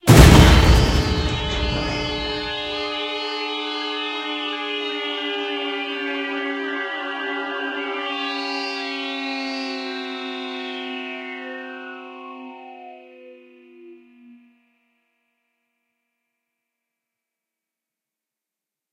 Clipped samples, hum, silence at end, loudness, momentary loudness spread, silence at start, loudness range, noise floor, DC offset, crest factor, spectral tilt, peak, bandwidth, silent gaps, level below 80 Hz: under 0.1%; none; 4.95 s; -21 LUFS; 17 LU; 0.05 s; 15 LU; -88 dBFS; under 0.1%; 22 dB; -5 dB/octave; 0 dBFS; 16 kHz; none; -28 dBFS